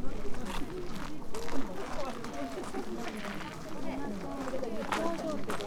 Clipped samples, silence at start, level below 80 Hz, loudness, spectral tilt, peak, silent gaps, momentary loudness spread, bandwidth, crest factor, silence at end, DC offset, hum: under 0.1%; 0 s; -44 dBFS; -38 LUFS; -5 dB/octave; -16 dBFS; none; 7 LU; 14 kHz; 16 dB; 0 s; under 0.1%; none